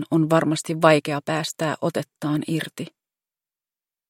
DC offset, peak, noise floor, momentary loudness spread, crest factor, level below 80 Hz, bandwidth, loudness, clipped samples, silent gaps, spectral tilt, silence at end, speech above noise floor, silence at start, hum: under 0.1%; 0 dBFS; under -90 dBFS; 11 LU; 22 dB; -68 dBFS; 16.5 kHz; -22 LUFS; under 0.1%; none; -5.5 dB/octave; 1.2 s; over 68 dB; 0 s; none